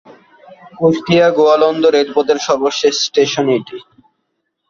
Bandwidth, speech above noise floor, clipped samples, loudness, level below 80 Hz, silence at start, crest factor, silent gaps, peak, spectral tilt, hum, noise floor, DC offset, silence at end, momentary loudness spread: 7.4 kHz; 57 dB; under 0.1%; -13 LUFS; -56 dBFS; 0.5 s; 14 dB; none; 0 dBFS; -4.5 dB/octave; none; -70 dBFS; under 0.1%; 0.9 s; 6 LU